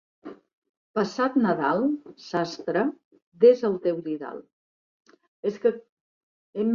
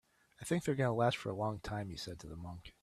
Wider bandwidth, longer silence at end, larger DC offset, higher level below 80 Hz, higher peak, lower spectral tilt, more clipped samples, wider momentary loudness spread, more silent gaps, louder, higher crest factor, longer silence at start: second, 7.2 kHz vs 14 kHz; about the same, 0 s vs 0.1 s; neither; second, -72 dBFS vs -62 dBFS; first, -6 dBFS vs -18 dBFS; about the same, -6.5 dB/octave vs -6 dB/octave; neither; first, 20 LU vs 15 LU; first, 0.53-0.62 s, 0.69-0.94 s, 3.04-3.11 s, 3.22-3.32 s, 4.53-5.00 s, 5.28-5.43 s, 5.89-6.53 s vs none; first, -25 LUFS vs -37 LUFS; about the same, 20 dB vs 20 dB; second, 0.25 s vs 0.4 s